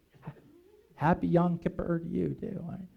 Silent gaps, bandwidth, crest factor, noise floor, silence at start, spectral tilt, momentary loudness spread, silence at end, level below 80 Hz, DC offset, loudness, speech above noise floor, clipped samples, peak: none; 4.6 kHz; 18 dB; -59 dBFS; 0.25 s; -10 dB/octave; 22 LU; 0.1 s; -54 dBFS; under 0.1%; -31 LUFS; 29 dB; under 0.1%; -14 dBFS